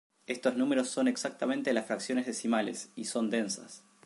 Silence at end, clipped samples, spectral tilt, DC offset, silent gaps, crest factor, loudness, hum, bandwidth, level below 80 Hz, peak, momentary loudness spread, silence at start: 0.25 s; under 0.1%; -3.5 dB/octave; under 0.1%; none; 18 dB; -32 LUFS; none; 11.5 kHz; -82 dBFS; -14 dBFS; 8 LU; 0.3 s